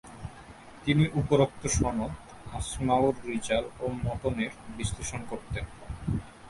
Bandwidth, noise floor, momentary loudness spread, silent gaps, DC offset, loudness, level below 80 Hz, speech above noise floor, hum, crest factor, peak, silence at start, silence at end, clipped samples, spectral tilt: 11.5 kHz; -48 dBFS; 16 LU; none; under 0.1%; -30 LUFS; -44 dBFS; 20 dB; none; 20 dB; -10 dBFS; 0.05 s; 0 s; under 0.1%; -5.5 dB/octave